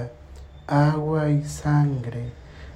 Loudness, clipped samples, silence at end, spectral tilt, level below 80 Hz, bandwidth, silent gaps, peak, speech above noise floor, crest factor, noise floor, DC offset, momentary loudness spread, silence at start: -23 LUFS; under 0.1%; 0 s; -7.5 dB/octave; -44 dBFS; 10.5 kHz; none; -8 dBFS; 21 dB; 16 dB; -43 dBFS; under 0.1%; 16 LU; 0 s